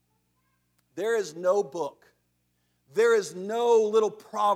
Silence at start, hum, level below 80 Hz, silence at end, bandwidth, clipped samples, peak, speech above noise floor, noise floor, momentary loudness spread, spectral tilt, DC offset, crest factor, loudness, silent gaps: 0.95 s; 60 Hz at -65 dBFS; -82 dBFS; 0 s; 15 kHz; under 0.1%; -10 dBFS; 48 dB; -73 dBFS; 12 LU; -4 dB/octave; under 0.1%; 16 dB; -26 LUFS; none